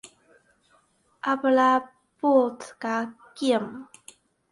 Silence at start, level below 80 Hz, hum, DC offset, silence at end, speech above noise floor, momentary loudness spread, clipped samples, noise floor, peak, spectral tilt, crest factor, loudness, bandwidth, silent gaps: 1.25 s; -74 dBFS; none; under 0.1%; 0.7 s; 41 dB; 16 LU; under 0.1%; -64 dBFS; -8 dBFS; -4.5 dB/octave; 18 dB; -24 LUFS; 11.5 kHz; none